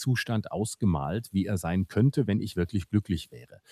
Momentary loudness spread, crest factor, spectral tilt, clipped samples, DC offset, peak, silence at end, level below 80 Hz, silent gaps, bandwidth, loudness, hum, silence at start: 7 LU; 16 dB; -6.5 dB/octave; under 0.1%; under 0.1%; -12 dBFS; 0.15 s; -54 dBFS; none; 14 kHz; -29 LUFS; none; 0 s